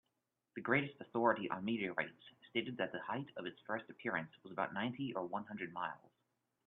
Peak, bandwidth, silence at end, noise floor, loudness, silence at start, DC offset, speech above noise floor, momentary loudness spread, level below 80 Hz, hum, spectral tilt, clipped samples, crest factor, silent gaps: -18 dBFS; 4.1 kHz; 0.7 s; -87 dBFS; -41 LUFS; 0.55 s; under 0.1%; 46 dB; 11 LU; -84 dBFS; none; -3.5 dB/octave; under 0.1%; 24 dB; none